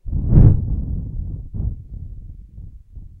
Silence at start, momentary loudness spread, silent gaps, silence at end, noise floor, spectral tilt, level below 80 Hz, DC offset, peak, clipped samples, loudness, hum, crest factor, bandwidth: 0.05 s; 27 LU; none; 0.15 s; -38 dBFS; -13.5 dB/octave; -22 dBFS; under 0.1%; 0 dBFS; under 0.1%; -19 LUFS; none; 18 dB; 2 kHz